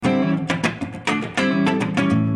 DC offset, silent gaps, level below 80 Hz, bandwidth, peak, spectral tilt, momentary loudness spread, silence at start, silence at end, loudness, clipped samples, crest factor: under 0.1%; none; -54 dBFS; 11.5 kHz; -6 dBFS; -6 dB/octave; 4 LU; 0 s; 0 s; -21 LUFS; under 0.1%; 14 dB